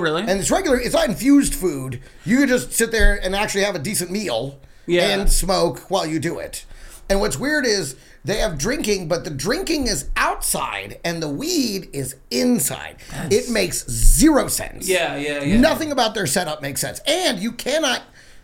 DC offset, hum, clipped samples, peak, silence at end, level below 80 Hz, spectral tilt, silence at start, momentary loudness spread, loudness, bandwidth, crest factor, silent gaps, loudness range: under 0.1%; none; under 0.1%; 0 dBFS; 0.05 s; -28 dBFS; -3.5 dB/octave; 0 s; 10 LU; -20 LUFS; 17 kHz; 20 dB; none; 4 LU